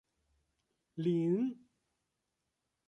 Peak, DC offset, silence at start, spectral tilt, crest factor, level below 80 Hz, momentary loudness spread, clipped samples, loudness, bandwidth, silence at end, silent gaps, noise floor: -22 dBFS; under 0.1%; 0.95 s; -9.5 dB/octave; 16 dB; -82 dBFS; 19 LU; under 0.1%; -34 LUFS; 8.2 kHz; 1.35 s; none; -86 dBFS